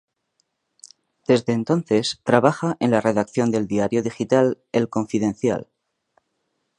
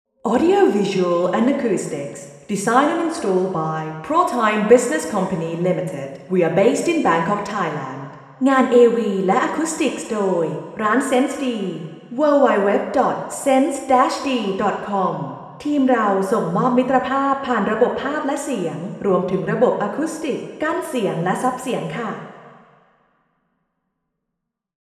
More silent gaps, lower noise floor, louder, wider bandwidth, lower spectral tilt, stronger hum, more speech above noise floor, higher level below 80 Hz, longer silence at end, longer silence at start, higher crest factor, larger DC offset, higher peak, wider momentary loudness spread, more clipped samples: neither; second, -74 dBFS vs -80 dBFS; about the same, -21 LUFS vs -19 LUFS; second, 10.5 kHz vs 13.5 kHz; about the same, -6 dB/octave vs -5.5 dB/octave; neither; second, 53 dB vs 61 dB; about the same, -60 dBFS vs -62 dBFS; second, 1.15 s vs 2.4 s; first, 1.3 s vs 0.25 s; about the same, 22 dB vs 20 dB; neither; about the same, 0 dBFS vs 0 dBFS; second, 6 LU vs 11 LU; neither